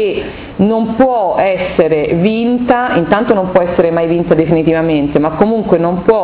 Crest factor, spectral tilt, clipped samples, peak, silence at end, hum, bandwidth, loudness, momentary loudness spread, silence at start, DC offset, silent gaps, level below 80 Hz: 12 dB; -11 dB/octave; 0.4%; 0 dBFS; 0 s; none; 4 kHz; -12 LUFS; 2 LU; 0 s; under 0.1%; none; -38 dBFS